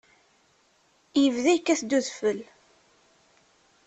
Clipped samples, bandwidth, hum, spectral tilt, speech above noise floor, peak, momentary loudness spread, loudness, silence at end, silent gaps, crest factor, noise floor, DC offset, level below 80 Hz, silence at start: under 0.1%; 8.6 kHz; none; -3 dB/octave; 41 dB; -10 dBFS; 7 LU; -25 LUFS; 1.45 s; none; 18 dB; -65 dBFS; under 0.1%; -72 dBFS; 1.15 s